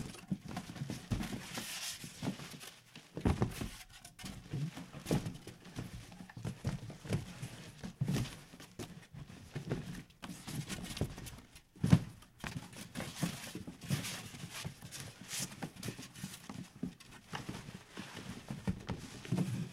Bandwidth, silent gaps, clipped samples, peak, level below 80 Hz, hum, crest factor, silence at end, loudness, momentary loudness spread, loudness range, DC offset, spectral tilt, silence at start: 16 kHz; none; under 0.1%; -10 dBFS; -56 dBFS; none; 32 dB; 0 s; -42 LUFS; 13 LU; 7 LU; under 0.1%; -5 dB/octave; 0 s